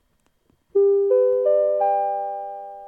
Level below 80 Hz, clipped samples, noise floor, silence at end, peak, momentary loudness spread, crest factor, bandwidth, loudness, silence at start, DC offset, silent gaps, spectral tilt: -72 dBFS; under 0.1%; -66 dBFS; 0 s; -10 dBFS; 12 LU; 12 dB; 2.6 kHz; -20 LUFS; 0.75 s; under 0.1%; none; -8 dB/octave